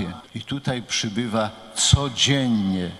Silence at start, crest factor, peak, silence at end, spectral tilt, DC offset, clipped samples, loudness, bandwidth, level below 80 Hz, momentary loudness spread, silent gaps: 0 s; 22 dB; -2 dBFS; 0 s; -4 dB/octave; under 0.1%; under 0.1%; -22 LUFS; 13 kHz; -38 dBFS; 12 LU; none